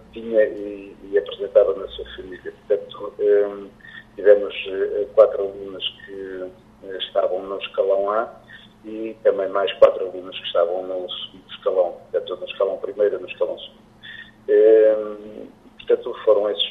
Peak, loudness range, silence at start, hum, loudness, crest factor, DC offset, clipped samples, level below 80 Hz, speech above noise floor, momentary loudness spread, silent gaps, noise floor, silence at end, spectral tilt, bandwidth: 0 dBFS; 5 LU; 0.15 s; none; -21 LUFS; 22 dB; under 0.1%; under 0.1%; -56 dBFS; 20 dB; 20 LU; none; -41 dBFS; 0 s; -5.5 dB/octave; 4.1 kHz